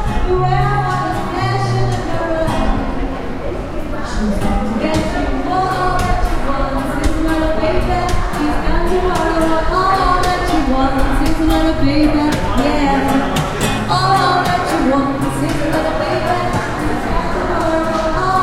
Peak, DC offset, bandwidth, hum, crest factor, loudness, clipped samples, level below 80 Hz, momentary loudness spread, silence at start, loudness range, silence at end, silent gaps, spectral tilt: -2 dBFS; under 0.1%; 15.5 kHz; none; 14 dB; -16 LUFS; under 0.1%; -22 dBFS; 5 LU; 0 s; 4 LU; 0 s; none; -6 dB/octave